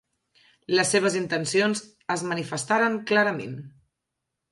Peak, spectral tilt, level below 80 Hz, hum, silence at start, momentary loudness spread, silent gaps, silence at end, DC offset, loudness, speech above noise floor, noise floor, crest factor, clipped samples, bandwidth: -8 dBFS; -3.5 dB/octave; -72 dBFS; none; 0.7 s; 10 LU; none; 0.85 s; under 0.1%; -24 LUFS; 58 dB; -83 dBFS; 18 dB; under 0.1%; 11.5 kHz